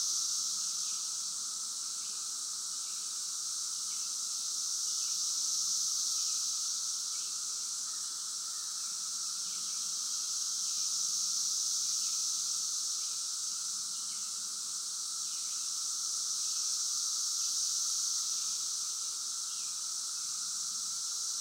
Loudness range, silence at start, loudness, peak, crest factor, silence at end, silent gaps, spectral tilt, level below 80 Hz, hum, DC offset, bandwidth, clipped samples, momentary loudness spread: 3 LU; 0 s; -32 LUFS; -20 dBFS; 16 dB; 0 s; none; 4 dB/octave; under -90 dBFS; none; under 0.1%; 16 kHz; under 0.1%; 5 LU